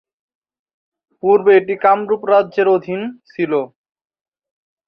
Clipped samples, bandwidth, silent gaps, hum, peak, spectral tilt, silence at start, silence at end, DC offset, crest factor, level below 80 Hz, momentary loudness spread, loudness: under 0.1%; 5.4 kHz; none; none; -2 dBFS; -8.5 dB/octave; 1.25 s; 1.2 s; under 0.1%; 16 dB; -66 dBFS; 13 LU; -15 LUFS